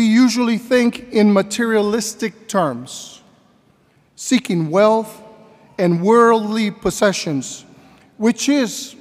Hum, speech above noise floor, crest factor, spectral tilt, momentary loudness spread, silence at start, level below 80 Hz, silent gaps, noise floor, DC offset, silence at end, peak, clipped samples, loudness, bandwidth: none; 39 dB; 16 dB; -5 dB/octave; 16 LU; 0 s; -54 dBFS; none; -56 dBFS; under 0.1%; 0.1 s; -2 dBFS; under 0.1%; -17 LUFS; 15.5 kHz